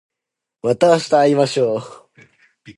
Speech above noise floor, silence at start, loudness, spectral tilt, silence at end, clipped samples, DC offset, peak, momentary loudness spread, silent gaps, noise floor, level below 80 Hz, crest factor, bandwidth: 68 dB; 0.65 s; -16 LUFS; -5.5 dB/octave; 0.05 s; under 0.1%; under 0.1%; -2 dBFS; 10 LU; none; -83 dBFS; -64 dBFS; 16 dB; 11.5 kHz